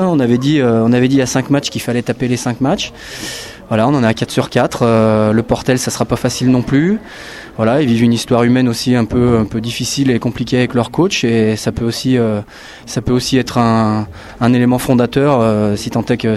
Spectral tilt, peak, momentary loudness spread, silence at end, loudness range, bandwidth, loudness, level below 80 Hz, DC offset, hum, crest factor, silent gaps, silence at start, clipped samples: -6 dB/octave; 0 dBFS; 9 LU; 0 s; 2 LU; 13.5 kHz; -14 LUFS; -40 dBFS; under 0.1%; none; 14 dB; none; 0 s; under 0.1%